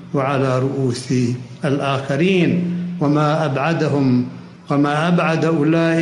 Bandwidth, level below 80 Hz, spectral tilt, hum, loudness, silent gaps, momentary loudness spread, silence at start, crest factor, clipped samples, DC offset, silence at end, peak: 11 kHz; -60 dBFS; -7 dB/octave; none; -18 LUFS; none; 6 LU; 0 s; 14 dB; under 0.1%; under 0.1%; 0 s; -4 dBFS